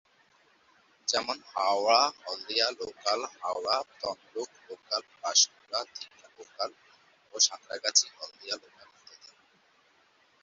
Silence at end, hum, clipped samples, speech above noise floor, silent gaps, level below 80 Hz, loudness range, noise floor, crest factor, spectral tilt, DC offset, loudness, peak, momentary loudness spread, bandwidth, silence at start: 1.25 s; none; under 0.1%; 35 dB; none; -78 dBFS; 3 LU; -66 dBFS; 26 dB; 1.5 dB/octave; under 0.1%; -29 LUFS; -6 dBFS; 16 LU; 8 kHz; 1.05 s